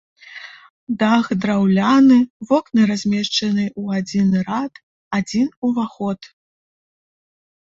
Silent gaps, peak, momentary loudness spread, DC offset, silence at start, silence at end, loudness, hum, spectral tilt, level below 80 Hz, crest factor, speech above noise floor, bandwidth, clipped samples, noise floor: 0.70-0.87 s, 2.30-2.40 s, 4.83-5.11 s, 5.57-5.62 s; -2 dBFS; 17 LU; under 0.1%; 0.3 s; 1.5 s; -18 LUFS; none; -6 dB/octave; -58 dBFS; 16 dB; 22 dB; 7.8 kHz; under 0.1%; -39 dBFS